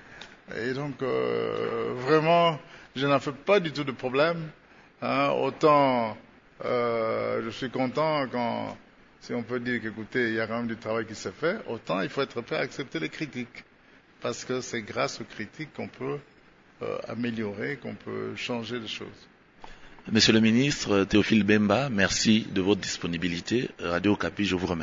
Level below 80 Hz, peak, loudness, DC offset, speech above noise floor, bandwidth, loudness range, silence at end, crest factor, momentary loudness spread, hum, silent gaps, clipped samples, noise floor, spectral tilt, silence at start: -56 dBFS; -8 dBFS; -27 LUFS; under 0.1%; 30 dB; 7.8 kHz; 10 LU; 0 s; 20 dB; 15 LU; none; none; under 0.1%; -57 dBFS; -5 dB/octave; 0 s